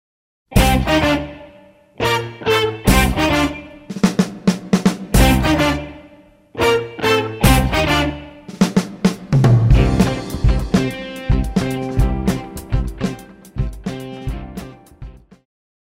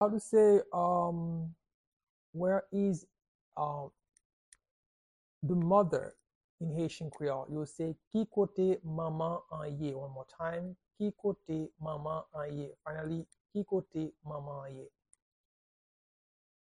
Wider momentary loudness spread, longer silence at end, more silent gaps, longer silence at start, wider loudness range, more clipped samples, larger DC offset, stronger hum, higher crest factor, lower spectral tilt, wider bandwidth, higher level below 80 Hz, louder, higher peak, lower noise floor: about the same, 15 LU vs 15 LU; second, 0.8 s vs 1.9 s; second, none vs 1.74-2.33 s, 3.28-3.52 s, 4.25-4.52 s, 4.71-5.41 s, 6.35-6.58 s, 8.07-8.11 s, 13.40-13.45 s; first, 0.5 s vs 0 s; about the same, 7 LU vs 7 LU; neither; neither; neither; about the same, 18 dB vs 20 dB; second, -5.5 dB/octave vs -8 dB/octave; first, 16.5 kHz vs 10.5 kHz; first, -24 dBFS vs -68 dBFS; first, -17 LUFS vs -35 LUFS; first, 0 dBFS vs -14 dBFS; second, -46 dBFS vs under -90 dBFS